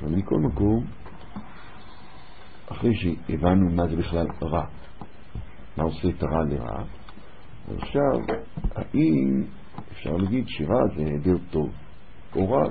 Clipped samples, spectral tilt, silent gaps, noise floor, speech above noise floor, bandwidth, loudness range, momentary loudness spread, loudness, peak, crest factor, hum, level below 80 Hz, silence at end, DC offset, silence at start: under 0.1%; -12 dB/octave; none; -47 dBFS; 23 dB; 4.7 kHz; 4 LU; 22 LU; -25 LUFS; -8 dBFS; 18 dB; none; -40 dBFS; 0 s; 2%; 0 s